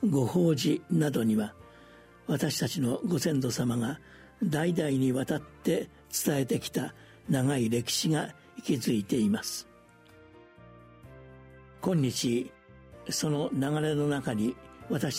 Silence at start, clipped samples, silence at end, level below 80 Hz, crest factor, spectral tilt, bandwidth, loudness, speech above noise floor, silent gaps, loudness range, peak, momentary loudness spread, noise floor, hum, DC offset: 0 s; under 0.1%; 0 s; -62 dBFS; 16 dB; -5.5 dB/octave; 16 kHz; -30 LUFS; 28 dB; none; 5 LU; -14 dBFS; 9 LU; -56 dBFS; none; under 0.1%